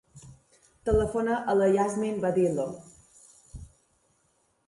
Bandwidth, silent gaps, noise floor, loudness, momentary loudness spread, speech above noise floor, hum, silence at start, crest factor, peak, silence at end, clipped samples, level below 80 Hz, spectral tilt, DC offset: 11.5 kHz; none; -70 dBFS; -27 LUFS; 24 LU; 45 dB; none; 0.15 s; 18 dB; -10 dBFS; 1 s; under 0.1%; -46 dBFS; -6.5 dB/octave; under 0.1%